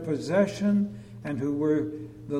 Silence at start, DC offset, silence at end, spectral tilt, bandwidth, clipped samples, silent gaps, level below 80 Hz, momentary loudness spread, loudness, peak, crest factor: 0 s; under 0.1%; 0 s; -7.5 dB/octave; 11 kHz; under 0.1%; none; -60 dBFS; 11 LU; -27 LUFS; -12 dBFS; 16 dB